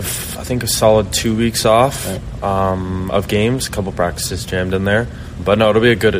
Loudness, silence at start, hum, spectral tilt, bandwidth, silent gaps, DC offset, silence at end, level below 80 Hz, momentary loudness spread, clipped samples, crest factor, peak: -16 LUFS; 0 s; none; -4.5 dB/octave; 15.5 kHz; none; under 0.1%; 0 s; -32 dBFS; 10 LU; under 0.1%; 16 dB; 0 dBFS